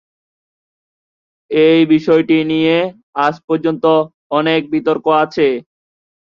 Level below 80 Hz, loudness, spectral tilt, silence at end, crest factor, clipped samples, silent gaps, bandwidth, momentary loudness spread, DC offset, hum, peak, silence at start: -60 dBFS; -14 LUFS; -7.5 dB/octave; 0.7 s; 16 dB; under 0.1%; 3.03-3.13 s, 3.44-3.48 s, 4.14-4.30 s; 6.8 kHz; 6 LU; under 0.1%; none; 0 dBFS; 1.5 s